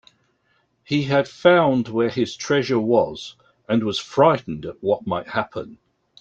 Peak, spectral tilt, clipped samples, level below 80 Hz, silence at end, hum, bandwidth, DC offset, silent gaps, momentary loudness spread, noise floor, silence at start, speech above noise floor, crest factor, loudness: -2 dBFS; -6 dB/octave; under 0.1%; -58 dBFS; 0.45 s; none; 8.2 kHz; under 0.1%; none; 14 LU; -66 dBFS; 0.9 s; 46 dB; 20 dB; -21 LUFS